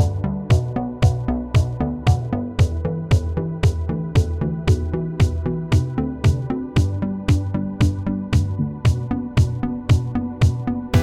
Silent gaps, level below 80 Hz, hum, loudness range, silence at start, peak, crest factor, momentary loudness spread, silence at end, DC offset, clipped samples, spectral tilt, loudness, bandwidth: none; -30 dBFS; none; 1 LU; 0 s; -4 dBFS; 16 dB; 5 LU; 0 s; 0.2%; under 0.1%; -7.5 dB/octave; -21 LUFS; 11.5 kHz